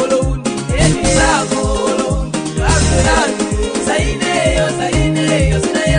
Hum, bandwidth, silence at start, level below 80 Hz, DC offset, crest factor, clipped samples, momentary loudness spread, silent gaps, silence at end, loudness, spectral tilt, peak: none; 10 kHz; 0 s; -22 dBFS; under 0.1%; 14 dB; under 0.1%; 6 LU; none; 0 s; -14 LUFS; -4.5 dB/octave; 0 dBFS